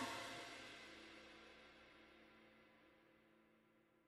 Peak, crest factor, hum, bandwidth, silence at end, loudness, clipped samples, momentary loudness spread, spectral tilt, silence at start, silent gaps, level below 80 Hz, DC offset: -34 dBFS; 24 dB; none; 15 kHz; 0 s; -56 LUFS; under 0.1%; 17 LU; -2.5 dB/octave; 0 s; none; -82 dBFS; under 0.1%